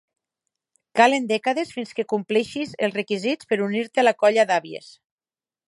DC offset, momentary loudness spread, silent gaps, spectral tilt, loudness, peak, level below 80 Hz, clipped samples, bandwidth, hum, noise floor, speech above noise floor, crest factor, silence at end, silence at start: under 0.1%; 11 LU; none; -4.5 dB/octave; -22 LUFS; -2 dBFS; -72 dBFS; under 0.1%; 11.5 kHz; none; under -90 dBFS; over 68 dB; 22 dB; 0.8 s; 0.95 s